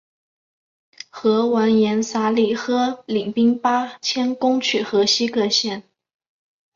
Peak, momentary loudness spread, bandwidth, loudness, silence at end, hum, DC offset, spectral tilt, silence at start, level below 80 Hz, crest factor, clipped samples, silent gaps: -6 dBFS; 6 LU; 7.6 kHz; -19 LUFS; 0.95 s; none; under 0.1%; -4 dB/octave; 1.15 s; -66 dBFS; 14 dB; under 0.1%; none